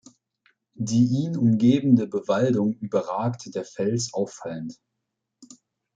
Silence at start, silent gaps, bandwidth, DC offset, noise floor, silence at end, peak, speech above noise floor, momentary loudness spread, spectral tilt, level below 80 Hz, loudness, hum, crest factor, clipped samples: 0.8 s; none; 9 kHz; under 0.1%; -81 dBFS; 0.5 s; -6 dBFS; 59 dB; 14 LU; -7 dB/octave; -66 dBFS; -24 LUFS; none; 18 dB; under 0.1%